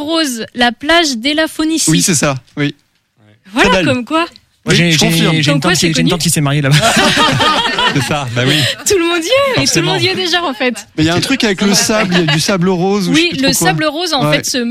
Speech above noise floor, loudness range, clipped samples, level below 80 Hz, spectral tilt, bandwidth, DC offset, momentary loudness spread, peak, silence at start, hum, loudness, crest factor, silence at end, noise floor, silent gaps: 38 dB; 3 LU; under 0.1%; -40 dBFS; -3.5 dB/octave; 16 kHz; under 0.1%; 6 LU; 0 dBFS; 0 s; none; -12 LUFS; 12 dB; 0 s; -51 dBFS; none